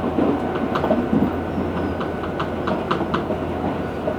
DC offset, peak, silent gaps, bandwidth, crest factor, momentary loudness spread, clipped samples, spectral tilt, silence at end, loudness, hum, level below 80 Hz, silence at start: under 0.1%; -6 dBFS; none; 18 kHz; 16 dB; 5 LU; under 0.1%; -8 dB/octave; 0 s; -23 LUFS; none; -40 dBFS; 0 s